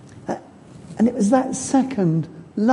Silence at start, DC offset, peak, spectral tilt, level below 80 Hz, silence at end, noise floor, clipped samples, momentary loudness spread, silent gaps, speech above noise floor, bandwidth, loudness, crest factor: 0.05 s; under 0.1%; -4 dBFS; -6.5 dB/octave; -56 dBFS; 0 s; -43 dBFS; under 0.1%; 12 LU; none; 24 dB; 11.5 kHz; -21 LUFS; 16 dB